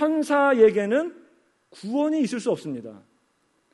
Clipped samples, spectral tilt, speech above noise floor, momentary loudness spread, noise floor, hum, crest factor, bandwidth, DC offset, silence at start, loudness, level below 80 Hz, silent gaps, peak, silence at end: under 0.1%; -5.5 dB/octave; 46 dB; 18 LU; -68 dBFS; none; 18 dB; 11.5 kHz; under 0.1%; 0 s; -22 LUFS; -74 dBFS; none; -6 dBFS; 0.75 s